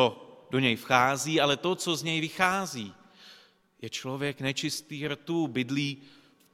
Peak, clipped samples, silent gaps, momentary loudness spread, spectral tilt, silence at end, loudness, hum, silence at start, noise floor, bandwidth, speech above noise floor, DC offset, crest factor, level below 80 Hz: -6 dBFS; under 0.1%; none; 14 LU; -4 dB/octave; 0.5 s; -28 LUFS; none; 0 s; -58 dBFS; 16.5 kHz; 29 dB; under 0.1%; 24 dB; -66 dBFS